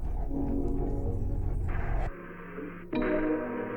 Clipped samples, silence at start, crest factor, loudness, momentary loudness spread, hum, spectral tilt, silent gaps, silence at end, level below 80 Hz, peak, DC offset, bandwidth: under 0.1%; 0 s; 14 dB; -33 LUFS; 12 LU; none; -9.5 dB/octave; none; 0 s; -34 dBFS; -16 dBFS; under 0.1%; 4.2 kHz